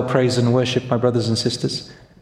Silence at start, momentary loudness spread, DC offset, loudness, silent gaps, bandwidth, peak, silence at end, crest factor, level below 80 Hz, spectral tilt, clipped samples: 0 s; 7 LU; under 0.1%; -19 LUFS; none; 11.5 kHz; -4 dBFS; 0.3 s; 16 dB; -52 dBFS; -5.5 dB/octave; under 0.1%